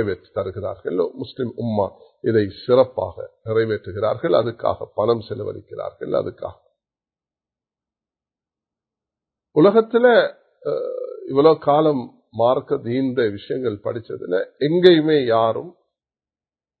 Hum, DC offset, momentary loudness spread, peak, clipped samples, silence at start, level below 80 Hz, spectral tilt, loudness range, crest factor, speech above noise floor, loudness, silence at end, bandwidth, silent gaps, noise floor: none; under 0.1%; 15 LU; 0 dBFS; under 0.1%; 0 s; -54 dBFS; -9 dB/octave; 9 LU; 20 dB; over 71 dB; -20 LUFS; 1.1 s; 4.6 kHz; none; under -90 dBFS